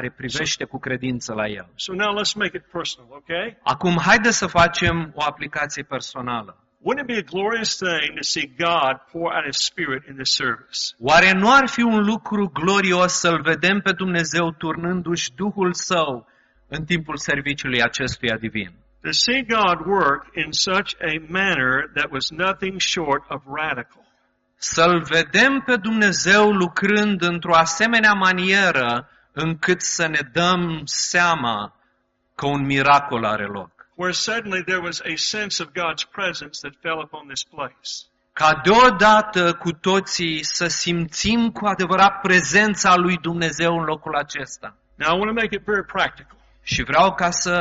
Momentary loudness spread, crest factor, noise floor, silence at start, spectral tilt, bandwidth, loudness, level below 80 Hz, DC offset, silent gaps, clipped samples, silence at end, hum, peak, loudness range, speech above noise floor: 13 LU; 18 dB; -67 dBFS; 0 s; -2.5 dB/octave; 8 kHz; -19 LUFS; -50 dBFS; under 0.1%; none; under 0.1%; 0 s; none; -2 dBFS; 7 LU; 47 dB